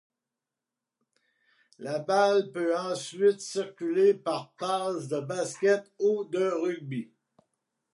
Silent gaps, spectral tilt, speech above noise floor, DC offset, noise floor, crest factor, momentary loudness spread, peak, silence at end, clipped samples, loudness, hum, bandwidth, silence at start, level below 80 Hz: none; -5 dB/octave; 61 dB; under 0.1%; -89 dBFS; 18 dB; 11 LU; -10 dBFS; 0.9 s; under 0.1%; -28 LUFS; none; 11.5 kHz; 1.8 s; -86 dBFS